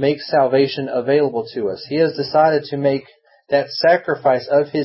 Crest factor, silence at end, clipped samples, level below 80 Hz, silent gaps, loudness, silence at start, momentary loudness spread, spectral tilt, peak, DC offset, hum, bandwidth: 16 dB; 0 s; under 0.1%; -64 dBFS; none; -18 LUFS; 0 s; 7 LU; -9.5 dB/octave; -2 dBFS; under 0.1%; none; 5.8 kHz